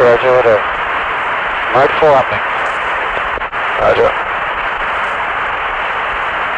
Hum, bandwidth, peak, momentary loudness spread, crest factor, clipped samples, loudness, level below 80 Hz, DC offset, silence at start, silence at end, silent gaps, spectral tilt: none; 9.2 kHz; -2 dBFS; 7 LU; 12 dB; under 0.1%; -14 LUFS; -38 dBFS; under 0.1%; 0 s; 0 s; none; -5 dB/octave